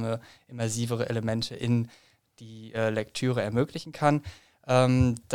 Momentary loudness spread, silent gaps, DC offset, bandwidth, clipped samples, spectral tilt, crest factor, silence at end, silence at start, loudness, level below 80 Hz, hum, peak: 18 LU; none; 0.1%; 14.5 kHz; under 0.1%; -6 dB/octave; 20 dB; 0 s; 0 s; -28 LUFS; -52 dBFS; none; -6 dBFS